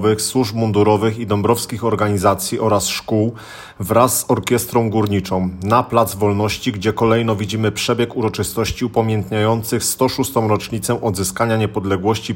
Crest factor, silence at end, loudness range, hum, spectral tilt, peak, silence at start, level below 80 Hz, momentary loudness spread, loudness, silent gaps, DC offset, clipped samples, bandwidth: 16 dB; 0 s; 1 LU; none; -5 dB/octave; 0 dBFS; 0 s; -46 dBFS; 5 LU; -18 LUFS; none; under 0.1%; under 0.1%; 17 kHz